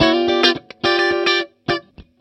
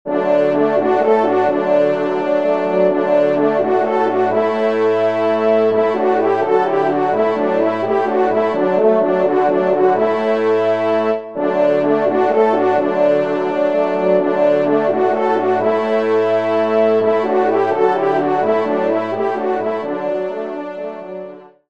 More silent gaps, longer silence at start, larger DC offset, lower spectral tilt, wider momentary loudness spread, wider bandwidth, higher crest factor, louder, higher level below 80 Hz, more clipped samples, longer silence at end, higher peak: neither; about the same, 0 s vs 0.05 s; second, under 0.1% vs 0.5%; second, -4.5 dB/octave vs -7.5 dB/octave; first, 9 LU vs 5 LU; first, 8.8 kHz vs 7.4 kHz; about the same, 18 dB vs 14 dB; about the same, -17 LUFS vs -16 LUFS; first, -48 dBFS vs -66 dBFS; neither; about the same, 0.2 s vs 0.2 s; about the same, 0 dBFS vs -2 dBFS